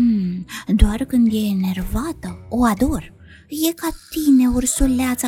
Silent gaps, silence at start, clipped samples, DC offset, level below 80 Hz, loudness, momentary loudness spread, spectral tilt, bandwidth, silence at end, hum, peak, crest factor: none; 0 s; under 0.1%; under 0.1%; -26 dBFS; -19 LUFS; 12 LU; -5 dB/octave; 17.5 kHz; 0 s; none; -2 dBFS; 18 dB